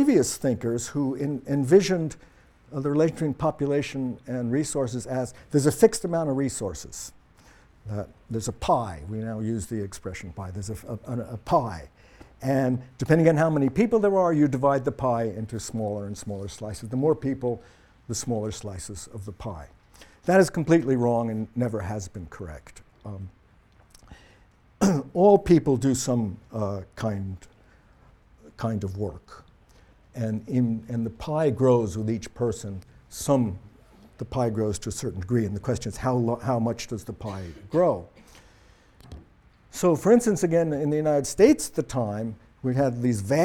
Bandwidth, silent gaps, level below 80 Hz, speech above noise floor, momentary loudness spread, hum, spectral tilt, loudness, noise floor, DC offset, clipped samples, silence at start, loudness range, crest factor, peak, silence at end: 17.5 kHz; none; -50 dBFS; 32 dB; 17 LU; none; -6.5 dB/octave; -25 LUFS; -57 dBFS; under 0.1%; under 0.1%; 0 s; 8 LU; 20 dB; -4 dBFS; 0 s